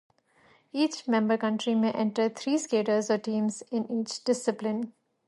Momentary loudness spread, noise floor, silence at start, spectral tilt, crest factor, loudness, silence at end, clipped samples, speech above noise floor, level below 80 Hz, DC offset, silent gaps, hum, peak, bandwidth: 6 LU; -63 dBFS; 0.75 s; -5 dB/octave; 16 dB; -28 LUFS; 0.35 s; under 0.1%; 35 dB; -78 dBFS; under 0.1%; none; none; -12 dBFS; 11.5 kHz